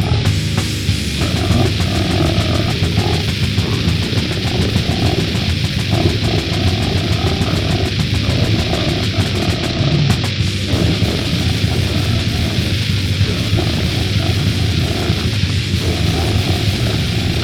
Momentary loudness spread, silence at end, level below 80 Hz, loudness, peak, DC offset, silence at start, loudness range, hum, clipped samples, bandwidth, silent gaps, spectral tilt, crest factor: 2 LU; 0 s; -28 dBFS; -16 LUFS; 0 dBFS; under 0.1%; 0 s; 0 LU; none; under 0.1%; 17 kHz; none; -5.5 dB/octave; 14 dB